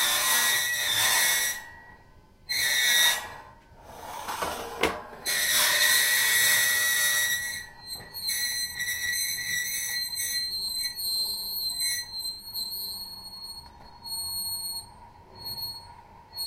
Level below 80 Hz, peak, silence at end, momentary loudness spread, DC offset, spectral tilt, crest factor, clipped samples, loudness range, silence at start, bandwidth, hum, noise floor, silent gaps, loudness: -58 dBFS; -6 dBFS; 0 s; 18 LU; under 0.1%; 1.5 dB/octave; 22 dB; under 0.1%; 11 LU; 0 s; 16 kHz; none; -54 dBFS; none; -25 LUFS